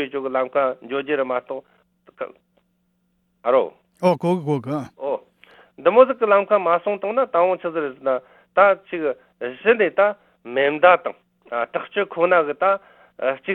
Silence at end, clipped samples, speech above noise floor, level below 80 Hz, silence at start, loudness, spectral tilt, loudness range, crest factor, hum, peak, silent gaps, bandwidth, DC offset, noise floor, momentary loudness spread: 0 s; under 0.1%; 48 dB; -68 dBFS; 0 s; -20 LUFS; -7 dB/octave; 6 LU; 20 dB; none; 0 dBFS; none; 9 kHz; under 0.1%; -68 dBFS; 14 LU